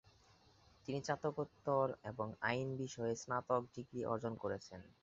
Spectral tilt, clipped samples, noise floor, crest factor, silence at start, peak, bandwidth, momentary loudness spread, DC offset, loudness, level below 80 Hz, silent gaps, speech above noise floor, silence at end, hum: -5 dB/octave; under 0.1%; -69 dBFS; 20 dB; 0.85 s; -20 dBFS; 7.6 kHz; 8 LU; under 0.1%; -41 LUFS; -72 dBFS; none; 28 dB; 0.1 s; none